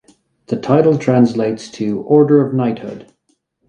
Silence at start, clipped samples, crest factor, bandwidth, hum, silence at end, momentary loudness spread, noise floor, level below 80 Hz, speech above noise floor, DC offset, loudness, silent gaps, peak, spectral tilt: 0.5 s; under 0.1%; 16 dB; 9.4 kHz; none; 0.7 s; 14 LU; -64 dBFS; -58 dBFS; 50 dB; under 0.1%; -15 LUFS; none; 0 dBFS; -8 dB/octave